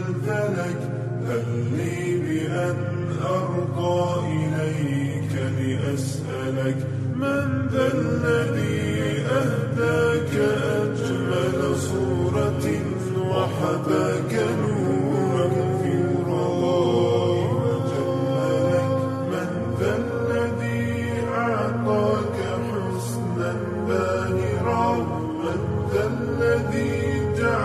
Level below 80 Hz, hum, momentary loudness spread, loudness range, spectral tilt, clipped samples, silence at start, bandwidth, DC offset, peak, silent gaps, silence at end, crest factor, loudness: -52 dBFS; none; 5 LU; 3 LU; -7 dB/octave; under 0.1%; 0 s; 13 kHz; under 0.1%; -8 dBFS; none; 0 s; 14 dB; -24 LUFS